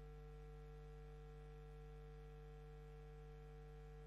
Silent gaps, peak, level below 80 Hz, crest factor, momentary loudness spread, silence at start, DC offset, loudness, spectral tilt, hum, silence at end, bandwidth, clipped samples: none; -48 dBFS; -58 dBFS; 8 dB; 1 LU; 0 s; under 0.1%; -59 LUFS; -7.5 dB/octave; none; 0 s; 12 kHz; under 0.1%